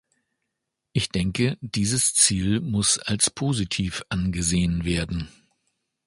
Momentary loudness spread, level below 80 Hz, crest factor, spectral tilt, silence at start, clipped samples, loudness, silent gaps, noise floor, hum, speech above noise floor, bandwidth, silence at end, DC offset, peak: 9 LU; -42 dBFS; 22 dB; -3.5 dB/octave; 0.95 s; under 0.1%; -23 LUFS; none; -82 dBFS; none; 58 dB; 12 kHz; 0.8 s; under 0.1%; -4 dBFS